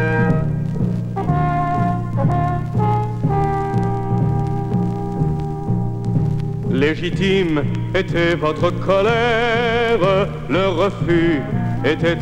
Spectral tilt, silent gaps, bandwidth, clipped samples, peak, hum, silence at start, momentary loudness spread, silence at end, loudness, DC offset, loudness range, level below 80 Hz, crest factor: -7.5 dB/octave; none; 8.8 kHz; under 0.1%; -2 dBFS; none; 0 s; 5 LU; 0 s; -19 LUFS; under 0.1%; 3 LU; -34 dBFS; 16 dB